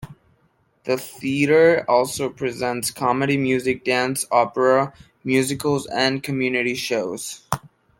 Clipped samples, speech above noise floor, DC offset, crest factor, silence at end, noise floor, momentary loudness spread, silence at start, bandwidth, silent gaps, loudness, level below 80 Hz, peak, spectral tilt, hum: under 0.1%; 42 dB; under 0.1%; 20 dB; 0.35 s; -63 dBFS; 12 LU; 0 s; 17 kHz; none; -21 LUFS; -58 dBFS; -2 dBFS; -4.5 dB/octave; none